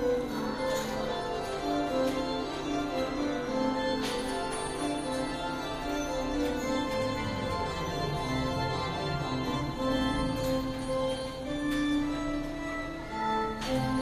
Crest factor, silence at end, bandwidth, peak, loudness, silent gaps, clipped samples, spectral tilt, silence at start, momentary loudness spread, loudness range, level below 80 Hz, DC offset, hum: 14 dB; 0 s; 15 kHz; -18 dBFS; -32 LUFS; none; under 0.1%; -5 dB/octave; 0 s; 4 LU; 1 LU; -46 dBFS; under 0.1%; none